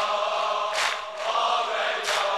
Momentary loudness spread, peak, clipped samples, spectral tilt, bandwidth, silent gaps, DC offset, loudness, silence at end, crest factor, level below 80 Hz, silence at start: 3 LU; -12 dBFS; under 0.1%; 1 dB/octave; 13 kHz; none; 0.1%; -25 LUFS; 0 s; 14 dB; -72 dBFS; 0 s